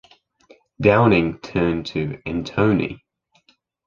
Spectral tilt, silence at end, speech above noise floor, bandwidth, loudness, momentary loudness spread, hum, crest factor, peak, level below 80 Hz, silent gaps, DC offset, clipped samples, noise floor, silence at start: -8 dB/octave; 0.9 s; 42 dB; 7.4 kHz; -20 LUFS; 12 LU; none; 20 dB; -2 dBFS; -44 dBFS; none; under 0.1%; under 0.1%; -61 dBFS; 0.8 s